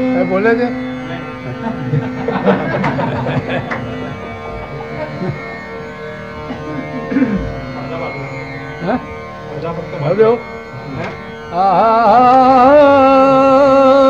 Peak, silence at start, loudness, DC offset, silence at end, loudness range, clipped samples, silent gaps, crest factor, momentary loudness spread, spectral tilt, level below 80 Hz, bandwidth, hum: 0 dBFS; 0 s; -14 LUFS; 0.3%; 0 s; 12 LU; under 0.1%; none; 14 dB; 18 LU; -7.5 dB/octave; -40 dBFS; 7.8 kHz; none